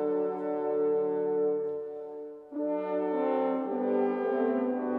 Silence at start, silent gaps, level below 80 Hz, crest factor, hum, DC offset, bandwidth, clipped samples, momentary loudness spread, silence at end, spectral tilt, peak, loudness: 0 s; none; -84 dBFS; 12 dB; none; under 0.1%; 4.1 kHz; under 0.1%; 10 LU; 0 s; -9.5 dB/octave; -18 dBFS; -30 LUFS